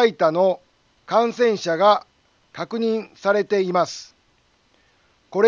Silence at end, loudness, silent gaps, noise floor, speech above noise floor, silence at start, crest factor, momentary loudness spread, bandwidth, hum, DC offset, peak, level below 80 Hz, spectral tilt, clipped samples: 0 s; -21 LUFS; none; -62 dBFS; 42 dB; 0 s; 18 dB; 13 LU; 7.6 kHz; none; under 0.1%; -4 dBFS; -72 dBFS; -5 dB/octave; under 0.1%